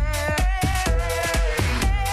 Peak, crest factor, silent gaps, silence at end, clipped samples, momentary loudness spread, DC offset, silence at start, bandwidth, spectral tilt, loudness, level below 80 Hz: -8 dBFS; 14 dB; none; 0 s; under 0.1%; 1 LU; under 0.1%; 0 s; 15 kHz; -4.5 dB/octave; -23 LUFS; -24 dBFS